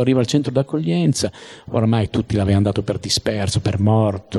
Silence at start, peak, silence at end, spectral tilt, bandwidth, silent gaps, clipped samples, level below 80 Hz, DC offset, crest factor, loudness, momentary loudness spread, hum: 0 s; -4 dBFS; 0 s; -6 dB/octave; 12.5 kHz; none; under 0.1%; -44 dBFS; under 0.1%; 14 dB; -19 LUFS; 6 LU; none